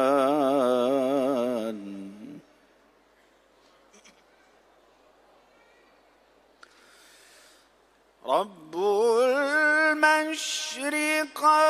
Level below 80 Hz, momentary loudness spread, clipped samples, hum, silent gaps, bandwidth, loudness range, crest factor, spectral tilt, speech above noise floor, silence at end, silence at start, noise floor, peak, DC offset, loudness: -78 dBFS; 18 LU; under 0.1%; none; none; 15.5 kHz; 15 LU; 20 dB; -2.5 dB/octave; 38 dB; 0 s; 0 s; -62 dBFS; -6 dBFS; under 0.1%; -24 LUFS